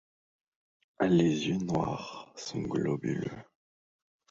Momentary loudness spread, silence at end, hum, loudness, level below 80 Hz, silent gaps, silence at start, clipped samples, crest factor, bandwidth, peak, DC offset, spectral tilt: 15 LU; 0.9 s; none; -31 LUFS; -62 dBFS; none; 1 s; under 0.1%; 18 dB; 7.8 kHz; -14 dBFS; under 0.1%; -6.5 dB/octave